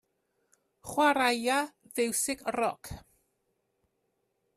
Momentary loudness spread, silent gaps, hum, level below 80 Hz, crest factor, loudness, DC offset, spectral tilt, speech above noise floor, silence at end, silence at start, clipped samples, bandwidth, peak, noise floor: 20 LU; none; none; -62 dBFS; 20 dB; -29 LUFS; under 0.1%; -2 dB/octave; 49 dB; 1.6 s; 0.85 s; under 0.1%; 15 kHz; -12 dBFS; -78 dBFS